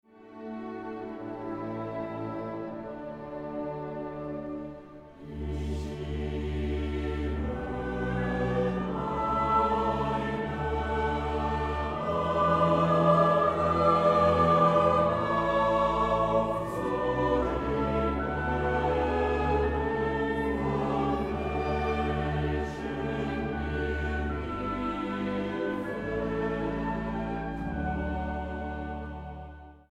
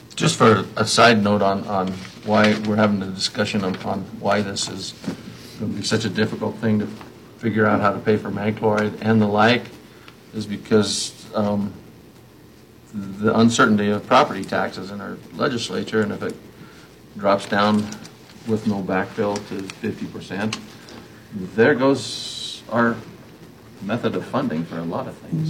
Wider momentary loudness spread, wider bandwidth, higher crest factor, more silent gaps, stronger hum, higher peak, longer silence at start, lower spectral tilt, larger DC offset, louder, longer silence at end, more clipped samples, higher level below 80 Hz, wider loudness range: about the same, 14 LU vs 16 LU; second, 10.5 kHz vs 15.5 kHz; about the same, 18 dB vs 20 dB; neither; neither; second, -10 dBFS vs 0 dBFS; about the same, 0.15 s vs 0.05 s; first, -7.5 dB/octave vs -5 dB/octave; neither; second, -29 LUFS vs -21 LUFS; first, 0.15 s vs 0 s; neither; first, -40 dBFS vs -58 dBFS; first, 13 LU vs 6 LU